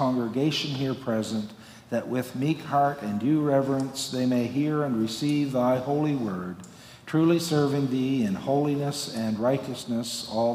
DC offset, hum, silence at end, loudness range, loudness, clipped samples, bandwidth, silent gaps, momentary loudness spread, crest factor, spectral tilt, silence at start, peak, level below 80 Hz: under 0.1%; none; 0 s; 2 LU; -26 LUFS; under 0.1%; 16 kHz; none; 8 LU; 16 dB; -6 dB/octave; 0 s; -10 dBFS; -64 dBFS